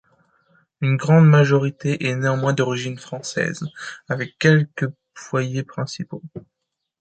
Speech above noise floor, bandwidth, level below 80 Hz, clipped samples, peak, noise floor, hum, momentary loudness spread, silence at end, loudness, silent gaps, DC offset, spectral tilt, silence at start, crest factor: 41 dB; 8.8 kHz; -62 dBFS; under 0.1%; -2 dBFS; -61 dBFS; none; 18 LU; 0.6 s; -20 LUFS; none; under 0.1%; -6.5 dB/octave; 0.8 s; 18 dB